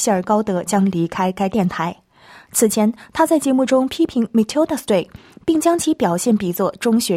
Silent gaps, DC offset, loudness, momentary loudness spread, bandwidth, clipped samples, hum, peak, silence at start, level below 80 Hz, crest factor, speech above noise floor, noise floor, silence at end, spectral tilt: none; under 0.1%; -18 LUFS; 5 LU; 16.5 kHz; under 0.1%; none; -2 dBFS; 0 s; -54 dBFS; 14 dB; 28 dB; -46 dBFS; 0 s; -5 dB/octave